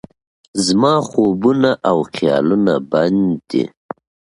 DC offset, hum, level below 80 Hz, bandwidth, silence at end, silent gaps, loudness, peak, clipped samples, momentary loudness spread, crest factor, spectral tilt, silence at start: under 0.1%; none; -54 dBFS; 11.5 kHz; 0.65 s; none; -16 LUFS; 0 dBFS; under 0.1%; 12 LU; 16 dB; -5.5 dB/octave; 0.55 s